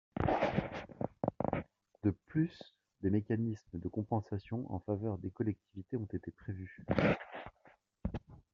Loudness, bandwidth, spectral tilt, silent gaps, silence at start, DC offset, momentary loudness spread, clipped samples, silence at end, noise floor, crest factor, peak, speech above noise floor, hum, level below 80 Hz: -38 LUFS; 7 kHz; -7 dB/octave; none; 0.15 s; under 0.1%; 13 LU; under 0.1%; 0.15 s; -67 dBFS; 22 dB; -16 dBFS; 30 dB; none; -56 dBFS